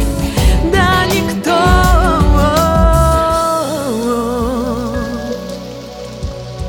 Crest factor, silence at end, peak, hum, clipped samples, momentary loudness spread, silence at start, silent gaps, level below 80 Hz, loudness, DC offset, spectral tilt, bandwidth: 12 dB; 0 s; 0 dBFS; none; under 0.1%; 14 LU; 0 s; none; -18 dBFS; -13 LUFS; under 0.1%; -5.5 dB/octave; 18 kHz